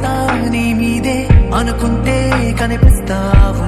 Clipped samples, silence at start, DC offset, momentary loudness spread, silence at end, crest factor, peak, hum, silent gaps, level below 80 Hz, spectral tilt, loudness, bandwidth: 1%; 0 s; under 0.1%; 4 LU; 0 s; 12 dB; 0 dBFS; none; none; -16 dBFS; -6.5 dB/octave; -14 LUFS; 13.5 kHz